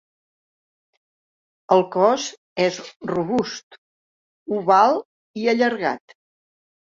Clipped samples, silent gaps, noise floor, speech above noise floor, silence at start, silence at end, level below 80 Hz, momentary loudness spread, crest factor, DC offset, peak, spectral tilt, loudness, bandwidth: under 0.1%; 2.38-2.56 s, 2.96-3.00 s, 3.63-3.71 s, 3.78-4.46 s, 5.05-5.34 s; under -90 dBFS; over 70 dB; 1.7 s; 0.95 s; -66 dBFS; 16 LU; 20 dB; under 0.1%; -2 dBFS; -4.5 dB/octave; -21 LUFS; 7.8 kHz